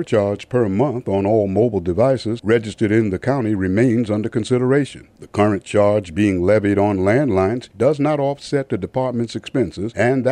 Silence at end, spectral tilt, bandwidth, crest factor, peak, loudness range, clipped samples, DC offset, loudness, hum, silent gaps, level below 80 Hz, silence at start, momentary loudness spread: 0 s; -7.5 dB/octave; 11 kHz; 14 dB; -4 dBFS; 2 LU; under 0.1%; under 0.1%; -18 LUFS; none; none; -50 dBFS; 0 s; 6 LU